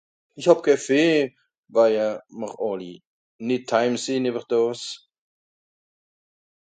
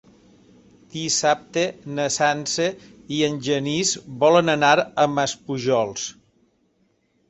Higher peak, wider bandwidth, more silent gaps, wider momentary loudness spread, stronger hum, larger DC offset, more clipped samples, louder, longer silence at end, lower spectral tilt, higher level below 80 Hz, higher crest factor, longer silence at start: about the same, -2 dBFS vs -2 dBFS; first, 9.4 kHz vs 8.4 kHz; first, 1.58-1.63 s, 3.06-3.39 s vs none; first, 15 LU vs 12 LU; neither; neither; neither; about the same, -22 LUFS vs -21 LUFS; first, 1.8 s vs 1.2 s; about the same, -4.5 dB/octave vs -3.5 dB/octave; second, -72 dBFS vs -62 dBFS; about the same, 22 dB vs 20 dB; second, 0.35 s vs 0.95 s